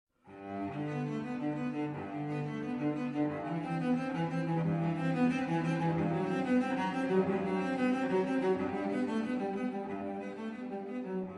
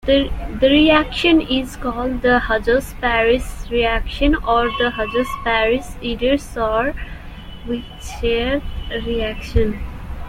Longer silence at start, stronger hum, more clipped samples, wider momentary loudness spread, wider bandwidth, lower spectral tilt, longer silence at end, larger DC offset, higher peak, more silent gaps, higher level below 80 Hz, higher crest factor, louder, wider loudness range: first, 0.25 s vs 0.05 s; neither; neither; second, 9 LU vs 12 LU; second, 10.5 kHz vs 16 kHz; first, -8 dB/octave vs -5.5 dB/octave; about the same, 0 s vs 0 s; neither; second, -18 dBFS vs -2 dBFS; neither; second, -70 dBFS vs -28 dBFS; about the same, 16 dB vs 16 dB; second, -34 LUFS vs -18 LUFS; about the same, 4 LU vs 6 LU